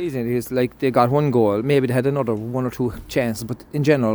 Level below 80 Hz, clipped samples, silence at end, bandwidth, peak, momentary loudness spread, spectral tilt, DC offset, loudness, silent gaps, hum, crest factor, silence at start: -48 dBFS; under 0.1%; 0 s; over 20 kHz; -2 dBFS; 8 LU; -7 dB/octave; under 0.1%; -21 LUFS; none; none; 18 dB; 0 s